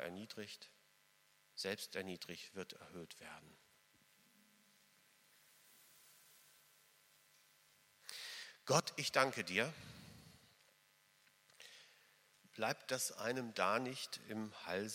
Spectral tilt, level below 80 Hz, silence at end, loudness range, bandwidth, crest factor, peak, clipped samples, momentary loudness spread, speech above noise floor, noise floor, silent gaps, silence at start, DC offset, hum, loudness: -3 dB/octave; -86 dBFS; 0 s; 17 LU; 16.5 kHz; 30 dB; -16 dBFS; under 0.1%; 26 LU; 31 dB; -73 dBFS; none; 0 s; under 0.1%; none; -42 LUFS